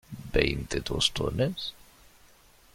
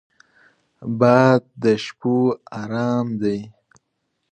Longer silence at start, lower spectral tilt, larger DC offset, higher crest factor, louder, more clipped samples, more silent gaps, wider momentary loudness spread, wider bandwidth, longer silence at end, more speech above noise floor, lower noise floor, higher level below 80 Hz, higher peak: second, 0.1 s vs 0.8 s; second, -4 dB/octave vs -7.5 dB/octave; neither; first, 26 dB vs 20 dB; second, -29 LUFS vs -20 LUFS; neither; neither; second, 8 LU vs 15 LU; first, 16.5 kHz vs 8.8 kHz; first, 1 s vs 0.8 s; second, 29 dB vs 55 dB; second, -58 dBFS vs -74 dBFS; first, -42 dBFS vs -62 dBFS; second, -6 dBFS vs 0 dBFS